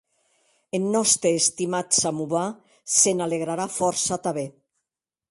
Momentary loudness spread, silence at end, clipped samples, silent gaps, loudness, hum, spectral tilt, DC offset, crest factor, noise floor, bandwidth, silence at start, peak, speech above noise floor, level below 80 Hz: 12 LU; 0.8 s; under 0.1%; none; -22 LUFS; none; -3 dB/octave; under 0.1%; 20 dB; -87 dBFS; 12 kHz; 0.75 s; -4 dBFS; 64 dB; -66 dBFS